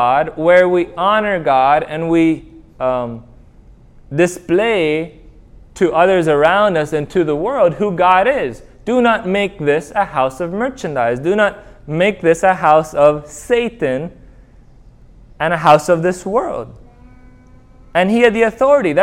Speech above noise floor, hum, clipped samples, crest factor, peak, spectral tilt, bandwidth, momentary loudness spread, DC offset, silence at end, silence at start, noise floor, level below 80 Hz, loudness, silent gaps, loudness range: 29 dB; none; under 0.1%; 16 dB; 0 dBFS; -6 dB/octave; 15 kHz; 10 LU; under 0.1%; 0 s; 0 s; -43 dBFS; -44 dBFS; -15 LUFS; none; 4 LU